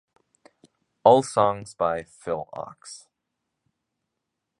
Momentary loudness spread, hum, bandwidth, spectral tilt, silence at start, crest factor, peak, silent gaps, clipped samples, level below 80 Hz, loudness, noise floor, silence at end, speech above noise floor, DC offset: 23 LU; none; 11.5 kHz; -5.5 dB/octave; 1.05 s; 24 dB; -2 dBFS; none; under 0.1%; -62 dBFS; -23 LUFS; -82 dBFS; 1.65 s; 59 dB; under 0.1%